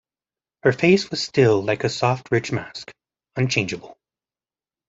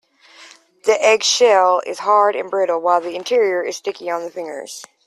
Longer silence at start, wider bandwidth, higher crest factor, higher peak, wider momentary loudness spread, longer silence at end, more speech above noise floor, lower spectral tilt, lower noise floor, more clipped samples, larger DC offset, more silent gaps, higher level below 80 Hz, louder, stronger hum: first, 0.65 s vs 0.4 s; second, 8 kHz vs 13.5 kHz; about the same, 20 dB vs 16 dB; about the same, -2 dBFS vs -2 dBFS; about the same, 15 LU vs 15 LU; first, 0.95 s vs 0.25 s; first, over 70 dB vs 28 dB; first, -5.5 dB/octave vs -1 dB/octave; first, under -90 dBFS vs -45 dBFS; neither; neither; neither; first, -58 dBFS vs -70 dBFS; second, -21 LUFS vs -17 LUFS; neither